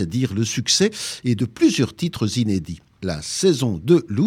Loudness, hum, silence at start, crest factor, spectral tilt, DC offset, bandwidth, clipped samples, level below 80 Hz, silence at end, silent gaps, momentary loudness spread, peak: -21 LUFS; none; 0 s; 16 dB; -5 dB/octave; under 0.1%; 16 kHz; under 0.1%; -50 dBFS; 0 s; none; 9 LU; -4 dBFS